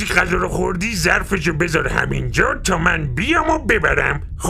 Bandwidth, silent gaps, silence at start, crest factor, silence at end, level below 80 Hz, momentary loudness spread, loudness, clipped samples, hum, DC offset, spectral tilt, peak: 15.5 kHz; none; 0 s; 18 dB; 0 s; -28 dBFS; 4 LU; -17 LUFS; under 0.1%; none; under 0.1%; -4.5 dB/octave; 0 dBFS